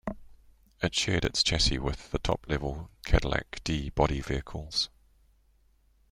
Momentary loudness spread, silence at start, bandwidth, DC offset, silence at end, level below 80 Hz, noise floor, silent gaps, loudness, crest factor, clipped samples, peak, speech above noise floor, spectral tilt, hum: 9 LU; 0.05 s; 15.5 kHz; under 0.1%; 1.25 s; -38 dBFS; -65 dBFS; none; -29 LUFS; 24 dB; under 0.1%; -8 dBFS; 36 dB; -4 dB/octave; none